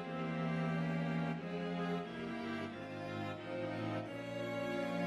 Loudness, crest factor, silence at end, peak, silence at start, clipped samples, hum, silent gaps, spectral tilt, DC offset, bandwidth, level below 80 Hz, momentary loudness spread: -40 LUFS; 12 dB; 0 s; -26 dBFS; 0 s; under 0.1%; none; none; -7 dB/octave; under 0.1%; 11 kHz; -74 dBFS; 6 LU